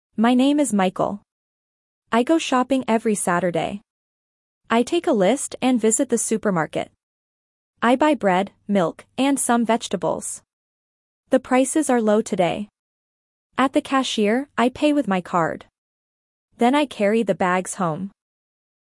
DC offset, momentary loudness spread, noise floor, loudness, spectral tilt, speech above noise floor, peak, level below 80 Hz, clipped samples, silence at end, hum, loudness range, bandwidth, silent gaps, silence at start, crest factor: under 0.1%; 8 LU; under -90 dBFS; -21 LUFS; -4.5 dB/octave; over 70 dB; -4 dBFS; -62 dBFS; under 0.1%; 0.85 s; none; 2 LU; 12 kHz; 1.32-2.02 s, 3.90-4.61 s, 7.03-7.74 s, 10.53-11.24 s, 12.79-13.50 s, 15.78-16.48 s; 0.2 s; 16 dB